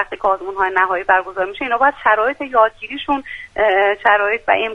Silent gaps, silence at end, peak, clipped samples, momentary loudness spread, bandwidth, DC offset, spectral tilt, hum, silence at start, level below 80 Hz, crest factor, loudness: none; 0 s; 0 dBFS; under 0.1%; 8 LU; 9.6 kHz; under 0.1%; -4.5 dB/octave; none; 0 s; -48 dBFS; 16 dB; -16 LUFS